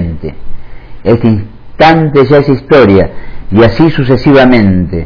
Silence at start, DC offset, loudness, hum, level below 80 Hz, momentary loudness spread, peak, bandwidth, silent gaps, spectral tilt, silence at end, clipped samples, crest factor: 0 s; under 0.1%; -7 LUFS; none; -26 dBFS; 12 LU; 0 dBFS; 5.4 kHz; none; -9 dB/octave; 0 s; 5%; 8 dB